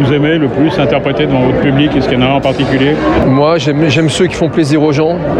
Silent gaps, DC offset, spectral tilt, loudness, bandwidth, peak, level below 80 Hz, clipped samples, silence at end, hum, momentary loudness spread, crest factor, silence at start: none; under 0.1%; -6.5 dB/octave; -11 LUFS; 11 kHz; 0 dBFS; -32 dBFS; under 0.1%; 0 s; none; 2 LU; 10 dB; 0 s